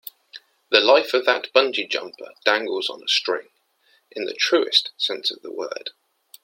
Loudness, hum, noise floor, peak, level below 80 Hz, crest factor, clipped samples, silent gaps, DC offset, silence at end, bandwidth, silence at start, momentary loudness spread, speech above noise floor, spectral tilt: -21 LUFS; none; -63 dBFS; 0 dBFS; -78 dBFS; 22 dB; under 0.1%; none; under 0.1%; 0.55 s; 16.5 kHz; 0.35 s; 15 LU; 41 dB; -1 dB/octave